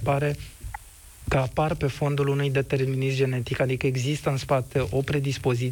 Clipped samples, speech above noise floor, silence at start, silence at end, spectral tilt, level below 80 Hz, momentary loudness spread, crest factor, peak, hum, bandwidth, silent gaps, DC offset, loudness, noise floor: under 0.1%; 22 dB; 0 s; 0 s; -6.5 dB/octave; -44 dBFS; 10 LU; 14 dB; -12 dBFS; none; 18 kHz; none; under 0.1%; -26 LUFS; -47 dBFS